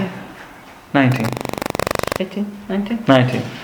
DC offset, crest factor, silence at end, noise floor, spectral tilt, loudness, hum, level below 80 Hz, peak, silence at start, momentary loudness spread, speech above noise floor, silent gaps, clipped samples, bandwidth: under 0.1%; 20 dB; 0 s; -40 dBFS; -6 dB/octave; -19 LUFS; none; -46 dBFS; 0 dBFS; 0 s; 19 LU; 23 dB; none; under 0.1%; over 20 kHz